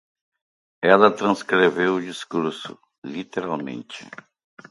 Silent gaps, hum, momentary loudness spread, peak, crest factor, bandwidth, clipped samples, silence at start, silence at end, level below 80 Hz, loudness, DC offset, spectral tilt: 2.98-3.02 s; none; 22 LU; 0 dBFS; 22 dB; 11.5 kHz; under 0.1%; 0.8 s; 0.6 s; -68 dBFS; -21 LUFS; under 0.1%; -5.5 dB/octave